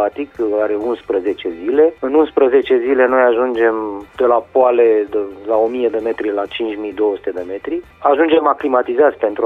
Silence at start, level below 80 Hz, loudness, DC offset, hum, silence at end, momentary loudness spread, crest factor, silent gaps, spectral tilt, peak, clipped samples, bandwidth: 0 s; -52 dBFS; -16 LUFS; under 0.1%; none; 0 s; 10 LU; 14 dB; none; -6.5 dB/octave; -2 dBFS; under 0.1%; 4.3 kHz